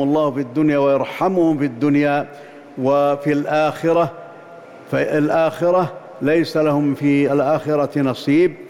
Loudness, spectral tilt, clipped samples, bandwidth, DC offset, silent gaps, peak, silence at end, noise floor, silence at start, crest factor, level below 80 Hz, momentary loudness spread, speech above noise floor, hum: -18 LUFS; -7.5 dB/octave; under 0.1%; 13.5 kHz; under 0.1%; none; -8 dBFS; 0 s; -39 dBFS; 0 s; 10 dB; -58 dBFS; 7 LU; 22 dB; none